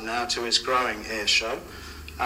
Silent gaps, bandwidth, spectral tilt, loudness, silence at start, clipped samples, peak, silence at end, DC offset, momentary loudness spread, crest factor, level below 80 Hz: none; 16 kHz; -1.5 dB/octave; -24 LUFS; 0 s; under 0.1%; -8 dBFS; 0 s; under 0.1%; 18 LU; 20 dB; -48 dBFS